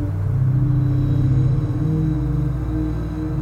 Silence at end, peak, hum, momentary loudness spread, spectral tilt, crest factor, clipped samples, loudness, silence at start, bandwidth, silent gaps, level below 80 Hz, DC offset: 0 s; -8 dBFS; none; 6 LU; -10.5 dB/octave; 10 dB; under 0.1%; -20 LUFS; 0 s; 4.2 kHz; none; -28 dBFS; under 0.1%